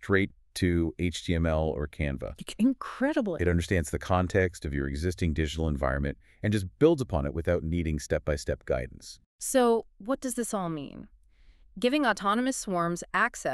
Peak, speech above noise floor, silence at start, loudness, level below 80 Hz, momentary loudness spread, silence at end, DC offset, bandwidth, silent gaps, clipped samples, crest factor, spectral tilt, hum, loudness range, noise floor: -8 dBFS; 29 dB; 0 s; -29 LUFS; -40 dBFS; 8 LU; 0 s; under 0.1%; 13.5 kHz; 9.26-9.39 s; under 0.1%; 20 dB; -5.5 dB/octave; none; 2 LU; -57 dBFS